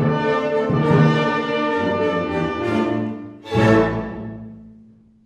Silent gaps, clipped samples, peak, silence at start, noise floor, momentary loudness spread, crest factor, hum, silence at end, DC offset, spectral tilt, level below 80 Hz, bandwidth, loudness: none; under 0.1%; -4 dBFS; 0 s; -49 dBFS; 16 LU; 16 dB; none; 0.5 s; under 0.1%; -7.5 dB/octave; -44 dBFS; 9.2 kHz; -19 LUFS